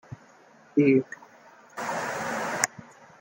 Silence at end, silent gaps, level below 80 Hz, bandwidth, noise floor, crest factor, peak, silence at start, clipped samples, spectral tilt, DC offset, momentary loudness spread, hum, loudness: 0.35 s; none; -72 dBFS; 17 kHz; -55 dBFS; 28 dB; 0 dBFS; 0.1 s; under 0.1%; -4.5 dB/octave; under 0.1%; 25 LU; none; -27 LUFS